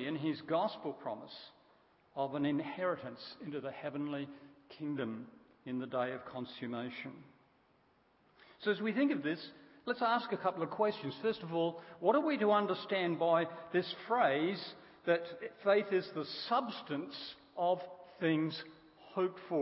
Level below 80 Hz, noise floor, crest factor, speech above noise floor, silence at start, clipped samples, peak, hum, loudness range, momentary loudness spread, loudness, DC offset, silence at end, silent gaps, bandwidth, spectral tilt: -82 dBFS; -71 dBFS; 20 dB; 35 dB; 0 s; under 0.1%; -16 dBFS; none; 9 LU; 15 LU; -36 LUFS; under 0.1%; 0 s; none; 5.6 kHz; -4 dB/octave